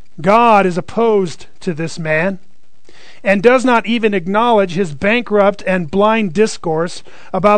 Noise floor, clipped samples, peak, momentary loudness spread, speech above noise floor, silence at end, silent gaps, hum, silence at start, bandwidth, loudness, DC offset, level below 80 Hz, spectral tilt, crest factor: -51 dBFS; 0.2%; 0 dBFS; 12 LU; 37 dB; 0 s; none; none; 0.2 s; 9.4 kHz; -14 LUFS; 4%; -48 dBFS; -6 dB/octave; 14 dB